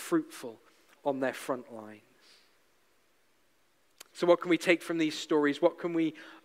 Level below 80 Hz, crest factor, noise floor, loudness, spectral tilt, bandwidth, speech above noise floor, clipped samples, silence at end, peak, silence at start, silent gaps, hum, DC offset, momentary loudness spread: -84 dBFS; 22 dB; -71 dBFS; -30 LUFS; -4.5 dB/octave; 15.5 kHz; 41 dB; under 0.1%; 0.05 s; -10 dBFS; 0 s; none; none; under 0.1%; 20 LU